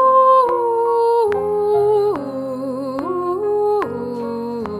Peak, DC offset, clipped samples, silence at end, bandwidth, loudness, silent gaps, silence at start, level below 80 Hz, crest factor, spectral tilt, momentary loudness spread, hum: -4 dBFS; under 0.1%; under 0.1%; 0 s; 12 kHz; -18 LUFS; none; 0 s; -56 dBFS; 14 dB; -7 dB/octave; 12 LU; none